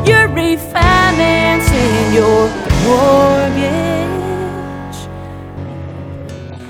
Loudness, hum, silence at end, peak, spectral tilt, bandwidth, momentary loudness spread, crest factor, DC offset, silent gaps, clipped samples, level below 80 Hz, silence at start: -12 LUFS; none; 0 s; 0 dBFS; -5.5 dB/octave; 19.5 kHz; 18 LU; 14 dB; under 0.1%; none; under 0.1%; -26 dBFS; 0 s